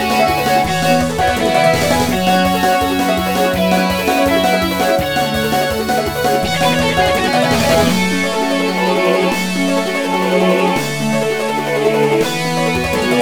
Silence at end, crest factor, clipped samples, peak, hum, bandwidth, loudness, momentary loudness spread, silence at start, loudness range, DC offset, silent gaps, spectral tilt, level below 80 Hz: 0 s; 14 dB; under 0.1%; 0 dBFS; none; 17.5 kHz; -14 LUFS; 4 LU; 0 s; 1 LU; 1%; none; -4.5 dB/octave; -36 dBFS